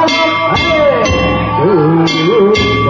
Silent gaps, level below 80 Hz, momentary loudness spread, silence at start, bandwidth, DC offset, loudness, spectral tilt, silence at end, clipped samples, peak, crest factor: none; -28 dBFS; 3 LU; 0 s; 7.6 kHz; under 0.1%; -10 LUFS; -5.5 dB/octave; 0 s; under 0.1%; -2 dBFS; 10 dB